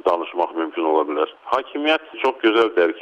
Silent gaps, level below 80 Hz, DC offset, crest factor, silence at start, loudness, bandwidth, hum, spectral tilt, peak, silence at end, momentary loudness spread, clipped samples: none; -66 dBFS; under 0.1%; 14 dB; 0.05 s; -20 LUFS; 8.2 kHz; none; -4 dB/octave; -6 dBFS; 0 s; 7 LU; under 0.1%